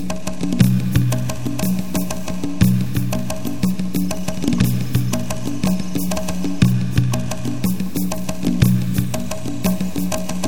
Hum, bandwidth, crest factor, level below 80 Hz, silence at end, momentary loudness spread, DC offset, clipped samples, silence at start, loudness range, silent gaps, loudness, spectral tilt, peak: none; 20 kHz; 20 dB; -38 dBFS; 0 s; 8 LU; 7%; under 0.1%; 0 s; 2 LU; none; -21 LUFS; -6 dB/octave; 0 dBFS